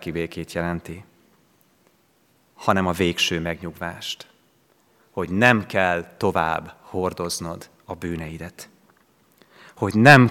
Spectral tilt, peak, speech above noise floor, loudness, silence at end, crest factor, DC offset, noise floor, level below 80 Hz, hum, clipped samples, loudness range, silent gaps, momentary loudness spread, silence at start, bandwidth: -5 dB/octave; 0 dBFS; 41 dB; -22 LUFS; 0 s; 24 dB; under 0.1%; -62 dBFS; -56 dBFS; none; under 0.1%; 6 LU; none; 18 LU; 0 s; 18 kHz